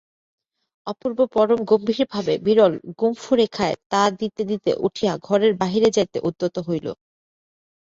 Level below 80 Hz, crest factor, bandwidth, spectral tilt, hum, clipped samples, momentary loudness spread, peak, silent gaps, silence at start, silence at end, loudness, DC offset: -60 dBFS; 18 dB; 7.8 kHz; -5.5 dB/octave; none; under 0.1%; 9 LU; -4 dBFS; 3.86-3.90 s; 0.85 s; 1 s; -21 LUFS; under 0.1%